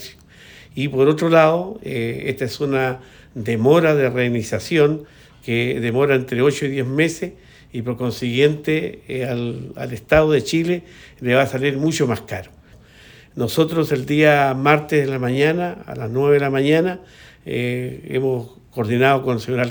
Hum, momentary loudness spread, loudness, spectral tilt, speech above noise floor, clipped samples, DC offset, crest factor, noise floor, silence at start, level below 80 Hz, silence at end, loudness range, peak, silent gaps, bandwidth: none; 15 LU; -19 LUFS; -6 dB/octave; 28 dB; under 0.1%; under 0.1%; 18 dB; -46 dBFS; 0 s; -48 dBFS; 0 s; 3 LU; -2 dBFS; none; over 20 kHz